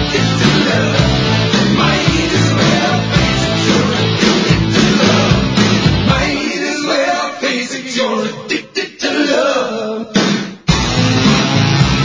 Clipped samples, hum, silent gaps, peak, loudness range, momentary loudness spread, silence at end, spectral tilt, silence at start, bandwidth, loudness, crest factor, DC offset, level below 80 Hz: under 0.1%; none; none; 0 dBFS; 4 LU; 6 LU; 0 s; -5 dB/octave; 0 s; 7.8 kHz; -13 LUFS; 14 dB; under 0.1%; -30 dBFS